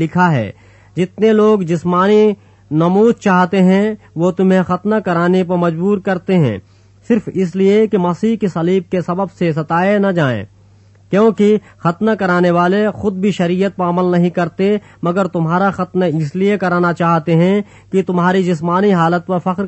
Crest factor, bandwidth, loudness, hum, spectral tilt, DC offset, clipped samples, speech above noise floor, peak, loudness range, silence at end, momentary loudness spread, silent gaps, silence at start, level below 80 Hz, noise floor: 14 dB; 8.4 kHz; -14 LUFS; none; -8 dB/octave; under 0.1%; under 0.1%; 32 dB; 0 dBFS; 3 LU; 0 s; 7 LU; none; 0 s; -54 dBFS; -46 dBFS